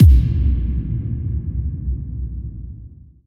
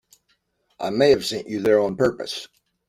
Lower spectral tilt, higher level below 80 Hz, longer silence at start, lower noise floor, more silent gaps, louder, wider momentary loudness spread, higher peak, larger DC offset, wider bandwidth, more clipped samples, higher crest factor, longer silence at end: first, -10 dB/octave vs -5 dB/octave; first, -20 dBFS vs -56 dBFS; second, 0 s vs 0.8 s; second, -40 dBFS vs -69 dBFS; neither; about the same, -21 LUFS vs -21 LUFS; first, 16 LU vs 13 LU; about the same, -2 dBFS vs -4 dBFS; neither; second, 3.1 kHz vs 14.5 kHz; neither; about the same, 16 dB vs 18 dB; about the same, 0.3 s vs 0.4 s